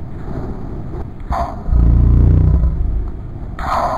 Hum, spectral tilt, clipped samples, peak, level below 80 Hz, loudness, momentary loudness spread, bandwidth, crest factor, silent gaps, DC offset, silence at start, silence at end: none; -9 dB/octave; under 0.1%; -2 dBFS; -16 dBFS; -17 LUFS; 16 LU; 7 kHz; 14 dB; none; under 0.1%; 0 s; 0 s